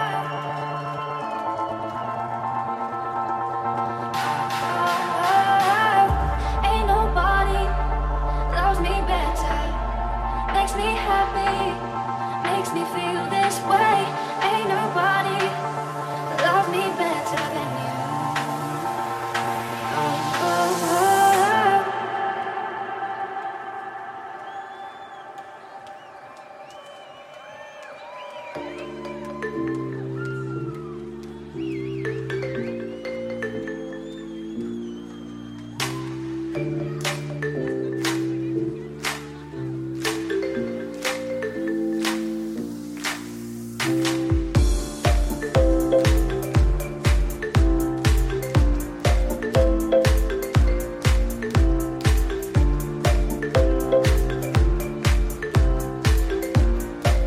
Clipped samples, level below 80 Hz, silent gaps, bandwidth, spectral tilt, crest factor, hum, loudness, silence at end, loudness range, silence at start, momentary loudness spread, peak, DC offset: under 0.1%; -28 dBFS; none; 15.5 kHz; -5.5 dB/octave; 18 dB; none; -24 LUFS; 0 s; 11 LU; 0 s; 15 LU; -6 dBFS; under 0.1%